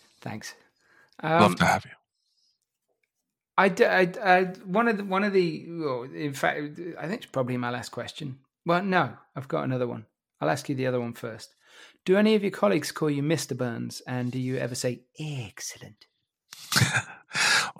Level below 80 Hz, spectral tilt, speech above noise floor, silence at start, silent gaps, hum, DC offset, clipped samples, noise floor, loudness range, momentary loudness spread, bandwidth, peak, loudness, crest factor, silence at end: -66 dBFS; -4.5 dB/octave; 58 dB; 0.25 s; none; none; under 0.1%; under 0.1%; -85 dBFS; 6 LU; 16 LU; 16.5 kHz; -4 dBFS; -26 LUFS; 22 dB; 0.1 s